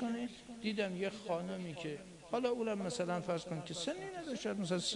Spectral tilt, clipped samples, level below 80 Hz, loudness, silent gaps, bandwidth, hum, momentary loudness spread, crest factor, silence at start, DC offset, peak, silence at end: -4.5 dB/octave; under 0.1%; -72 dBFS; -40 LUFS; none; 11 kHz; none; 7 LU; 16 dB; 0 s; under 0.1%; -22 dBFS; 0 s